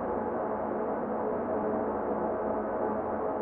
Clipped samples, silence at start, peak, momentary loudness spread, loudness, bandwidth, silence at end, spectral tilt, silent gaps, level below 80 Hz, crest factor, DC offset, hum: under 0.1%; 0 s; -18 dBFS; 1 LU; -32 LUFS; 3.4 kHz; 0 s; -11 dB/octave; none; -58 dBFS; 12 dB; under 0.1%; none